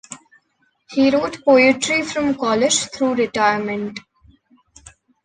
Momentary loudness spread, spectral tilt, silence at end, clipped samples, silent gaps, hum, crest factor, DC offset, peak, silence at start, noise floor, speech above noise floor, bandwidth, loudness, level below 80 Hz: 15 LU; -3 dB/octave; 1.25 s; under 0.1%; none; none; 18 dB; under 0.1%; -2 dBFS; 0.1 s; -65 dBFS; 48 dB; 10 kHz; -17 LUFS; -56 dBFS